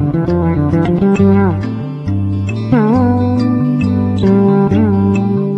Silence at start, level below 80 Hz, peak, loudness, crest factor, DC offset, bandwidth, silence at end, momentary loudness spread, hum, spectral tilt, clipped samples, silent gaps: 0 s; -36 dBFS; 0 dBFS; -13 LUFS; 12 dB; under 0.1%; 11 kHz; 0 s; 7 LU; none; -9.5 dB/octave; under 0.1%; none